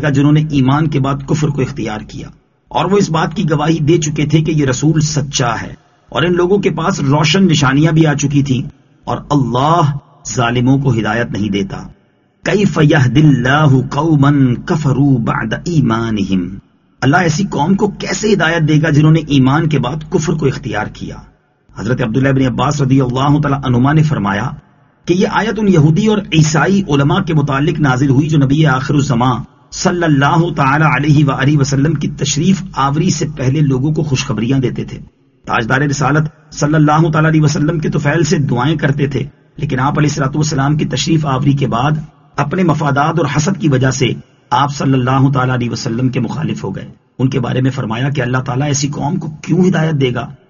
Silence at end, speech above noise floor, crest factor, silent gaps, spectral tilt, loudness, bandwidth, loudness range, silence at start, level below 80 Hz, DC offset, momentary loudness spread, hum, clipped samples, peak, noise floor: 0.15 s; 39 dB; 12 dB; none; -6 dB/octave; -13 LUFS; 7.4 kHz; 3 LU; 0 s; -38 dBFS; under 0.1%; 9 LU; none; under 0.1%; 0 dBFS; -51 dBFS